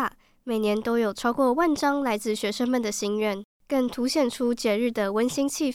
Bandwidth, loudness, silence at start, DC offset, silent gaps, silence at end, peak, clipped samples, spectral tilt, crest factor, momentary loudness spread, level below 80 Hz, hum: 16.5 kHz; -25 LUFS; 0 s; under 0.1%; 3.44-3.60 s; 0 s; -10 dBFS; under 0.1%; -4 dB/octave; 14 dB; 6 LU; -58 dBFS; none